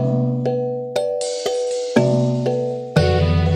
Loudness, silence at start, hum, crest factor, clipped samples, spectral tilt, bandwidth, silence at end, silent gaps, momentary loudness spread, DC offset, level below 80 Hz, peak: -20 LUFS; 0 s; none; 18 dB; under 0.1%; -6.5 dB/octave; 11 kHz; 0 s; none; 6 LU; under 0.1%; -36 dBFS; -2 dBFS